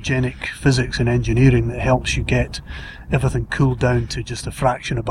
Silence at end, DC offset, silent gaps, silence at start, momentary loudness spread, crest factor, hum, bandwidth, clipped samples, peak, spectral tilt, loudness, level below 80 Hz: 0 s; under 0.1%; none; 0 s; 11 LU; 16 dB; none; 12 kHz; under 0.1%; -2 dBFS; -6 dB/octave; -19 LUFS; -30 dBFS